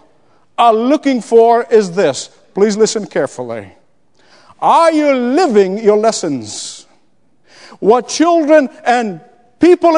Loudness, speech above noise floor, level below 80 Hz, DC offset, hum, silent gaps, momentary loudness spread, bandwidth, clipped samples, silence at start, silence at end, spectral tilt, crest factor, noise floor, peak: -12 LUFS; 47 dB; -60 dBFS; 0.2%; none; none; 15 LU; 10.5 kHz; 0.2%; 0.6 s; 0 s; -4.5 dB/octave; 14 dB; -59 dBFS; 0 dBFS